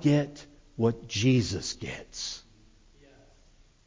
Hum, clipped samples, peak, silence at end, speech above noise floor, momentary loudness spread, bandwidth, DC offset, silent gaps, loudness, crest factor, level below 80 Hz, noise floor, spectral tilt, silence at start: none; under 0.1%; -12 dBFS; 1.45 s; 31 dB; 17 LU; 7.6 kHz; under 0.1%; none; -29 LUFS; 18 dB; -52 dBFS; -59 dBFS; -5.5 dB/octave; 0 s